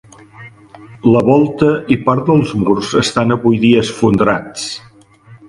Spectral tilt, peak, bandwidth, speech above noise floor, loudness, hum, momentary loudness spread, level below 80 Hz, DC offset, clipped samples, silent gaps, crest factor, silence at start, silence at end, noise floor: -6 dB/octave; 0 dBFS; 11.5 kHz; 30 dB; -13 LUFS; none; 8 LU; -44 dBFS; under 0.1%; under 0.1%; none; 14 dB; 0.4 s; 0.15 s; -42 dBFS